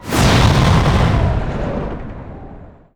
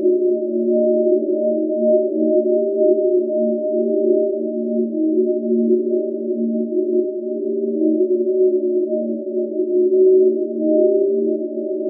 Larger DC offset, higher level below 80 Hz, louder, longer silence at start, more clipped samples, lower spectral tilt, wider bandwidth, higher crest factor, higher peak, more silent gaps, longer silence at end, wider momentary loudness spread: neither; first, -22 dBFS vs -90 dBFS; first, -15 LUFS vs -18 LUFS; about the same, 0 s vs 0 s; neither; about the same, -5.5 dB/octave vs -5.5 dB/octave; first, over 20 kHz vs 0.7 kHz; about the same, 14 dB vs 12 dB; first, 0 dBFS vs -4 dBFS; neither; first, 0.25 s vs 0 s; first, 20 LU vs 6 LU